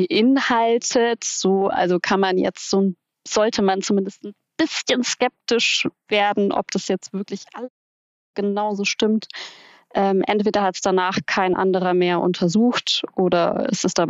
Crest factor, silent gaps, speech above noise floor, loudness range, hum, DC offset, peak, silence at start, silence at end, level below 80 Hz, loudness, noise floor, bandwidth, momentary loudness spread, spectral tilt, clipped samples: 16 dB; 7.70-8.34 s; over 70 dB; 4 LU; none; under 0.1%; -6 dBFS; 0 s; 0 s; -60 dBFS; -20 LUFS; under -90 dBFS; 8 kHz; 12 LU; -4 dB/octave; under 0.1%